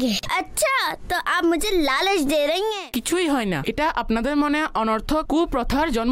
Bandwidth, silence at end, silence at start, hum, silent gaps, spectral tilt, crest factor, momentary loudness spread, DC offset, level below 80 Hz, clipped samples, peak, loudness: 16 kHz; 0 s; 0 s; none; none; -3.5 dB/octave; 10 dB; 4 LU; under 0.1%; -38 dBFS; under 0.1%; -12 dBFS; -22 LUFS